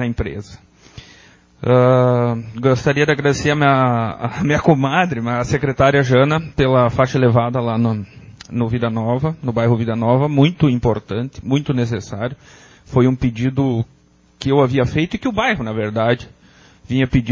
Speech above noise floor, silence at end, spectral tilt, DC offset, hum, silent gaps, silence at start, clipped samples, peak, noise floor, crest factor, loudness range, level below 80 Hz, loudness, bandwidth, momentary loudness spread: 31 dB; 0 s; -7 dB/octave; under 0.1%; none; none; 0 s; under 0.1%; 0 dBFS; -48 dBFS; 16 dB; 4 LU; -40 dBFS; -17 LUFS; 7.6 kHz; 10 LU